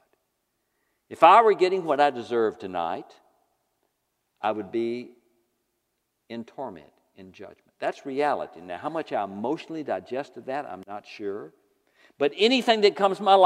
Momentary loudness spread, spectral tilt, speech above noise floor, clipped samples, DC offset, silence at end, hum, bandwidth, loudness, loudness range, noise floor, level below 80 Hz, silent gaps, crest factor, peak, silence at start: 19 LU; -4.5 dB/octave; 53 dB; under 0.1%; under 0.1%; 0 s; none; 12.5 kHz; -24 LUFS; 13 LU; -77 dBFS; -80 dBFS; none; 24 dB; -2 dBFS; 1.1 s